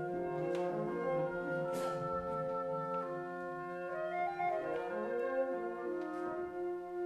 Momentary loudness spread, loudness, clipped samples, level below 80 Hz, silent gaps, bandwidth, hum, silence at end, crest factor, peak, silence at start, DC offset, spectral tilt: 5 LU; -38 LUFS; under 0.1%; -68 dBFS; none; 13.5 kHz; none; 0 s; 14 dB; -24 dBFS; 0 s; under 0.1%; -7 dB/octave